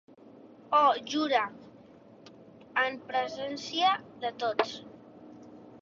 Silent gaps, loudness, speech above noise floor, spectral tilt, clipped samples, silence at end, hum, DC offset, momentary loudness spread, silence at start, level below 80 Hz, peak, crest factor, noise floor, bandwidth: none; -29 LUFS; 25 dB; -3 dB/octave; under 0.1%; 0.05 s; none; under 0.1%; 26 LU; 0.25 s; -76 dBFS; -10 dBFS; 22 dB; -54 dBFS; 7.6 kHz